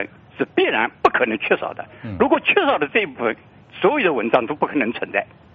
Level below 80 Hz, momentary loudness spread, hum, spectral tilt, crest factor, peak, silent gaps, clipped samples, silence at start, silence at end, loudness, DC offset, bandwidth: -56 dBFS; 11 LU; none; -2.5 dB/octave; 20 dB; 0 dBFS; none; under 0.1%; 0 s; 0.3 s; -19 LUFS; under 0.1%; 7 kHz